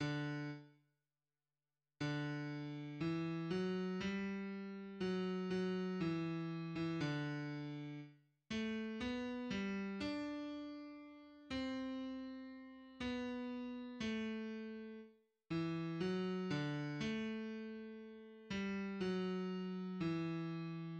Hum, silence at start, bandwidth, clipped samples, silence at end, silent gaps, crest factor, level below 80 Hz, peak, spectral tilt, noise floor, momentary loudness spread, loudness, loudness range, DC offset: none; 0 s; 8.8 kHz; under 0.1%; 0 s; none; 14 dB; -72 dBFS; -28 dBFS; -7 dB/octave; under -90 dBFS; 11 LU; -43 LUFS; 4 LU; under 0.1%